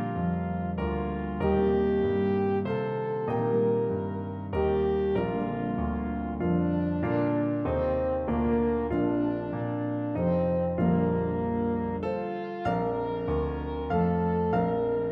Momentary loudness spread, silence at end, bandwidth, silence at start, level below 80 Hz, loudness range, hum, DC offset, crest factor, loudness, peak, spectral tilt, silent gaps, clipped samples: 6 LU; 0 s; 5 kHz; 0 s; -42 dBFS; 2 LU; none; under 0.1%; 14 dB; -28 LUFS; -14 dBFS; -10.5 dB/octave; none; under 0.1%